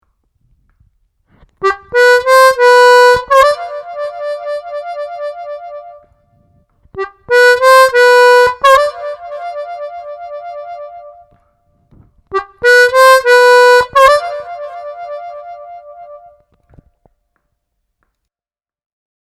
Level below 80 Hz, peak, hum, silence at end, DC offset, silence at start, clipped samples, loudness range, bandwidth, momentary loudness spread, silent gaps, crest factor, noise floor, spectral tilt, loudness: -48 dBFS; 0 dBFS; none; 3.2 s; under 0.1%; 1.6 s; under 0.1%; 16 LU; 14.5 kHz; 21 LU; none; 12 dB; under -90 dBFS; -1 dB/octave; -8 LUFS